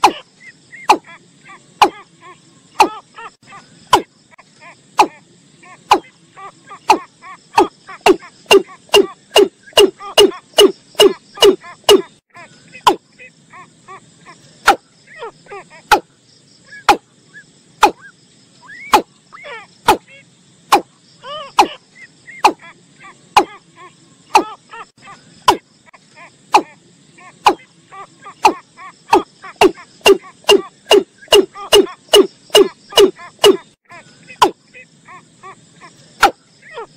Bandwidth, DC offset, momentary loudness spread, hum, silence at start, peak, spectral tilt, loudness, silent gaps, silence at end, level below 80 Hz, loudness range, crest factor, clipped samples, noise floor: 16 kHz; under 0.1%; 21 LU; none; 0.05 s; 0 dBFS; -2 dB/octave; -14 LUFS; none; 0.1 s; -50 dBFS; 7 LU; 16 dB; under 0.1%; -50 dBFS